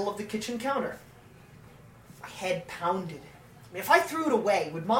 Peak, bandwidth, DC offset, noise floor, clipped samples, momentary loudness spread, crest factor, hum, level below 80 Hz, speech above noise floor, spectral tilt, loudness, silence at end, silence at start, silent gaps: -6 dBFS; 16.5 kHz; under 0.1%; -52 dBFS; under 0.1%; 20 LU; 24 dB; 60 Hz at -60 dBFS; -64 dBFS; 24 dB; -4.5 dB/octave; -29 LUFS; 0 s; 0 s; none